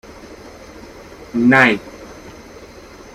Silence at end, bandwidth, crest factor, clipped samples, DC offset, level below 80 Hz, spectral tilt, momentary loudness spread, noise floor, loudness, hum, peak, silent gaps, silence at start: 0.5 s; 13 kHz; 20 dB; under 0.1%; under 0.1%; -48 dBFS; -5.5 dB/octave; 27 LU; -39 dBFS; -14 LUFS; none; 0 dBFS; none; 0.3 s